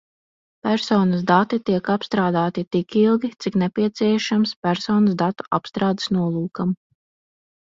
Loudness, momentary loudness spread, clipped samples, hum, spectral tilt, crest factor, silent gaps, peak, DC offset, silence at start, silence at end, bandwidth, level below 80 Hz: -21 LUFS; 6 LU; under 0.1%; none; -6.5 dB/octave; 18 dB; 4.56-4.62 s; -2 dBFS; under 0.1%; 0.65 s; 1 s; 7.6 kHz; -60 dBFS